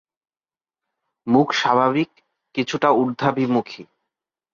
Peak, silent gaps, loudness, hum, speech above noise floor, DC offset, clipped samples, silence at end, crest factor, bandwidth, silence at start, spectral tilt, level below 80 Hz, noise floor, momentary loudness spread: -4 dBFS; none; -20 LUFS; none; over 71 dB; under 0.1%; under 0.1%; 0.7 s; 18 dB; 7.4 kHz; 1.25 s; -5.5 dB/octave; -66 dBFS; under -90 dBFS; 14 LU